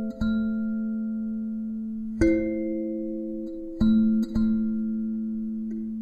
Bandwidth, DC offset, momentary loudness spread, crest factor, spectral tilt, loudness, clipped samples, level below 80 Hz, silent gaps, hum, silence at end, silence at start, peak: 7 kHz; under 0.1%; 10 LU; 18 dB; -8.5 dB/octave; -27 LUFS; under 0.1%; -42 dBFS; none; none; 0 s; 0 s; -8 dBFS